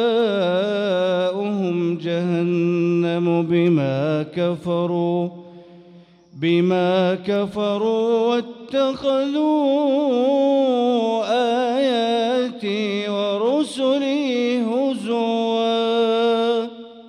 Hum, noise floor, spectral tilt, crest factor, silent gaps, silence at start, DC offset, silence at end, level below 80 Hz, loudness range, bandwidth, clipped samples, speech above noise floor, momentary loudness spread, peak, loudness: none; -47 dBFS; -7 dB/octave; 12 dB; none; 0 s; under 0.1%; 0 s; -66 dBFS; 3 LU; 11 kHz; under 0.1%; 29 dB; 5 LU; -8 dBFS; -20 LUFS